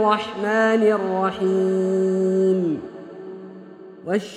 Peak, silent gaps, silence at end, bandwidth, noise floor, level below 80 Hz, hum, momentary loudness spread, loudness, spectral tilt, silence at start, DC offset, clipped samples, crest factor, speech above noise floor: -6 dBFS; none; 0 s; 10 kHz; -41 dBFS; -66 dBFS; none; 19 LU; -20 LUFS; -6.5 dB/octave; 0 s; under 0.1%; under 0.1%; 16 dB; 21 dB